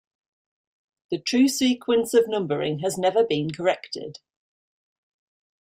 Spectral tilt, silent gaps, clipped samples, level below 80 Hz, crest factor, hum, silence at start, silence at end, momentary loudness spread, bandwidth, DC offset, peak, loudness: -4.5 dB/octave; none; under 0.1%; -68 dBFS; 18 dB; none; 1.1 s; 1.5 s; 12 LU; 16 kHz; under 0.1%; -8 dBFS; -23 LUFS